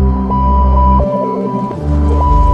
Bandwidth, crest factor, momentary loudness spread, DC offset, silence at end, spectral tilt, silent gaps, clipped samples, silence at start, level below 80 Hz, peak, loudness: 5.2 kHz; 10 dB; 6 LU; under 0.1%; 0 s; -10 dB/octave; none; under 0.1%; 0 s; -14 dBFS; 0 dBFS; -13 LUFS